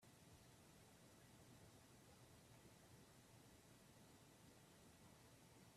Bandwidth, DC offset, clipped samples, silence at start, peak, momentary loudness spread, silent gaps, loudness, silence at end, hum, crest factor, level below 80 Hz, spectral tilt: 14.5 kHz; under 0.1%; under 0.1%; 0 s; -54 dBFS; 1 LU; none; -68 LUFS; 0 s; none; 14 dB; -82 dBFS; -4 dB/octave